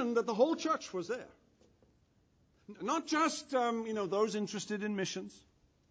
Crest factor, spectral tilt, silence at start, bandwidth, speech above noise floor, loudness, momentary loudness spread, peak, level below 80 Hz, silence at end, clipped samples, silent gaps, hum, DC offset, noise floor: 20 dB; -4 dB/octave; 0 s; 10 kHz; 36 dB; -35 LUFS; 11 LU; -16 dBFS; -76 dBFS; 0.55 s; under 0.1%; none; none; under 0.1%; -71 dBFS